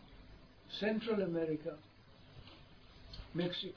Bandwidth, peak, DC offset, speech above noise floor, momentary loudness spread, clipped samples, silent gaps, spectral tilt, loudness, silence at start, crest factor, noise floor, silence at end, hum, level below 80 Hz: 5.4 kHz; -24 dBFS; under 0.1%; 22 dB; 23 LU; under 0.1%; none; -4.5 dB/octave; -39 LUFS; 0 s; 18 dB; -59 dBFS; 0 s; none; -62 dBFS